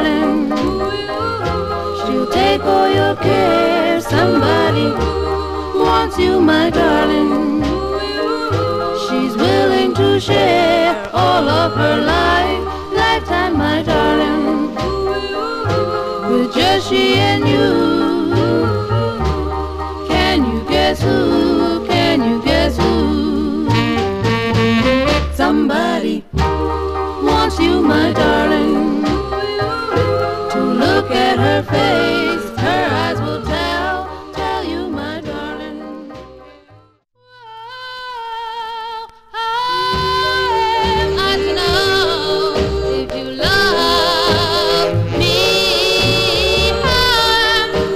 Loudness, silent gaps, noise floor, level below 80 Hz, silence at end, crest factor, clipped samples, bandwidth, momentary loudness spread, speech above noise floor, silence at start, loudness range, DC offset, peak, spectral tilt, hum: -15 LUFS; none; -52 dBFS; -30 dBFS; 0 s; 14 dB; under 0.1%; 16 kHz; 8 LU; 39 dB; 0 s; 7 LU; 0.1%; 0 dBFS; -5.5 dB/octave; none